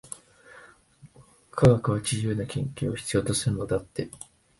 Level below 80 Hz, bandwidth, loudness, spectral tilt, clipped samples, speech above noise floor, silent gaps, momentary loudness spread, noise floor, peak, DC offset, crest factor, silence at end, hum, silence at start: -50 dBFS; 12 kHz; -26 LUFS; -5.5 dB/octave; under 0.1%; 29 dB; none; 18 LU; -54 dBFS; -6 dBFS; under 0.1%; 22 dB; 0.45 s; none; 0.1 s